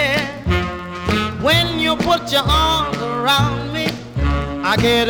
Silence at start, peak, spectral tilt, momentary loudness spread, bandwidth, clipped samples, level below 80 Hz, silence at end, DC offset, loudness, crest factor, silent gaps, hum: 0 s; -2 dBFS; -4.5 dB/octave; 7 LU; over 20 kHz; under 0.1%; -30 dBFS; 0 s; under 0.1%; -17 LUFS; 16 dB; none; none